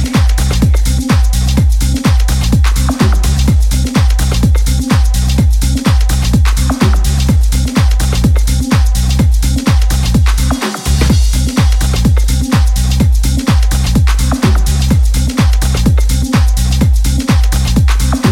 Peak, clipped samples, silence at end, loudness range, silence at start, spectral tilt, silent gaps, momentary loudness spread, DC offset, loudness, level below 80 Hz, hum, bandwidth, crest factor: 0 dBFS; under 0.1%; 0 s; 0 LU; 0 s; -5.5 dB/octave; none; 1 LU; under 0.1%; -12 LUFS; -12 dBFS; none; 16.5 kHz; 8 dB